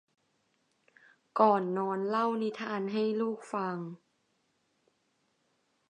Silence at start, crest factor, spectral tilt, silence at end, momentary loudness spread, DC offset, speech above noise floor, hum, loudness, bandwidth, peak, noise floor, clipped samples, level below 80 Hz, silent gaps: 1.35 s; 24 dB; -7 dB/octave; 1.95 s; 11 LU; under 0.1%; 45 dB; none; -31 LUFS; 10 kHz; -10 dBFS; -76 dBFS; under 0.1%; -90 dBFS; none